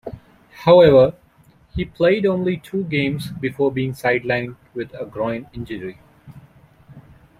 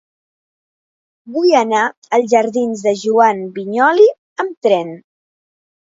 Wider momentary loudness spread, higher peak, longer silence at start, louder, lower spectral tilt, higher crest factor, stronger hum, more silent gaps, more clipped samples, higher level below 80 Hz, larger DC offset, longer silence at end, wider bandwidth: first, 19 LU vs 11 LU; about the same, -2 dBFS vs 0 dBFS; second, 0.05 s vs 1.25 s; second, -18 LUFS vs -15 LUFS; first, -7.5 dB/octave vs -4.5 dB/octave; about the same, 18 dB vs 16 dB; neither; second, none vs 1.97-2.02 s, 4.18-4.36 s, 4.57-4.62 s; neither; first, -48 dBFS vs -70 dBFS; neither; second, 0.4 s vs 0.95 s; first, 14 kHz vs 7.8 kHz